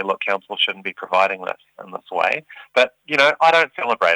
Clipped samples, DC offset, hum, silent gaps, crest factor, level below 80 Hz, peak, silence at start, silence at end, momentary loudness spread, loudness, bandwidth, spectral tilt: under 0.1%; under 0.1%; none; none; 18 dB; -72 dBFS; -2 dBFS; 0 s; 0 s; 14 LU; -19 LUFS; over 20 kHz; -2.5 dB/octave